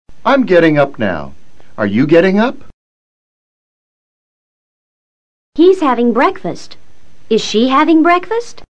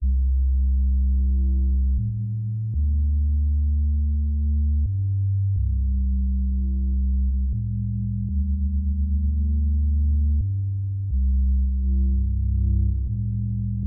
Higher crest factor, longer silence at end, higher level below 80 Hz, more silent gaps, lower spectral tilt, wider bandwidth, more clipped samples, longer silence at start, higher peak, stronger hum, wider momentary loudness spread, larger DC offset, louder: first, 14 dB vs 8 dB; about the same, 0 s vs 0 s; second, -48 dBFS vs -22 dBFS; first, 2.73-5.52 s vs none; second, -6 dB/octave vs -18.5 dB/octave; first, 9 kHz vs 0.5 kHz; first, 0.2% vs under 0.1%; about the same, 0.05 s vs 0 s; first, 0 dBFS vs -14 dBFS; neither; first, 12 LU vs 4 LU; first, 5% vs under 0.1%; first, -12 LUFS vs -24 LUFS